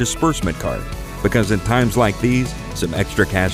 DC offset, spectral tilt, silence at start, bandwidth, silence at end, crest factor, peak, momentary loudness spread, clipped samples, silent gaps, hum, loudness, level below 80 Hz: under 0.1%; -5.5 dB/octave; 0 s; 16 kHz; 0 s; 16 dB; -2 dBFS; 8 LU; under 0.1%; none; none; -19 LUFS; -30 dBFS